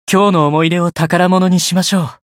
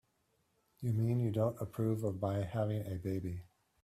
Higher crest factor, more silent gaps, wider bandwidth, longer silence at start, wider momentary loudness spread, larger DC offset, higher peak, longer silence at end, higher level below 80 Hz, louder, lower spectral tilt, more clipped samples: second, 12 dB vs 18 dB; neither; first, 16 kHz vs 14.5 kHz; second, 0.1 s vs 0.8 s; second, 4 LU vs 8 LU; neither; first, 0 dBFS vs -20 dBFS; second, 0.2 s vs 0.4 s; first, -54 dBFS vs -66 dBFS; first, -13 LUFS vs -37 LUFS; second, -5 dB/octave vs -9 dB/octave; neither